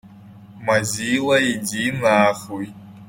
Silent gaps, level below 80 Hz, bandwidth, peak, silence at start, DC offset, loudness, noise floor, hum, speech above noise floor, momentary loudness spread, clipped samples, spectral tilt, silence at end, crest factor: none; -56 dBFS; 16.5 kHz; -2 dBFS; 0.05 s; under 0.1%; -19 LUFS; -43 dBFS; none; 23 dB; 14 LU; under 0.1%; -4 dB/octave; 0.05 s; 18 dB